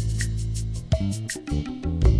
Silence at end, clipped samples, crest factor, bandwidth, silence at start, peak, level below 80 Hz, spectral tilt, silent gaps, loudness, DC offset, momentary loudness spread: 0 s; under 0.1%; 16 dB; 11 kHz; 0 s; -8 dBFS; -28 dBFS; -6 dB/octave; none; -28 LUFS; under 0.1%; 4 LU